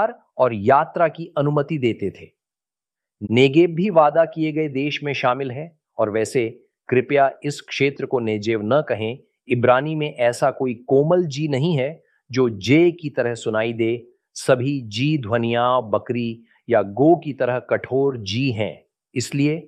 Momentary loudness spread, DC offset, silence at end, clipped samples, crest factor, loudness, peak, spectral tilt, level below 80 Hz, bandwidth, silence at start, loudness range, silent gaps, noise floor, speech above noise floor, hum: 11 LU; under 0.1%; 0 s; under 0.1%; 18 dB; -20 LUFS; -2 dBFS; -6.5 dB/octave; -64 dBFS; 12.5 kHz; 0 s; 2 LU; none; under -90 dBFS; over 70 dB; none